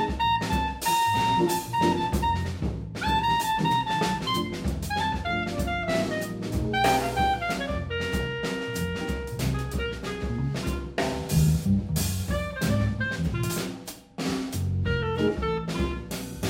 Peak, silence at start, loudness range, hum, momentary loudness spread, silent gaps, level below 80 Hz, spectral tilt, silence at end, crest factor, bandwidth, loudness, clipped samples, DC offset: -10 dBFS; 0 s; 4 LU; none; 8 LU; none; -38 dBFS; -5 dB/octave; 0 s; 16 dB; 16 kHz; -27 LUFS; under 0.1%; under 0.1%